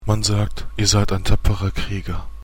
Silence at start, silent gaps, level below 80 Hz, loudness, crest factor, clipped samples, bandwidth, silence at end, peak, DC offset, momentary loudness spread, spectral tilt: 0 s; none; -26 dBFS; -21 LUFS; 18 dB; under 0.1%; 16.5 kHz; 0 s; 0 dBFS; under 0.1%; 10 LU; -4.5 dB/octave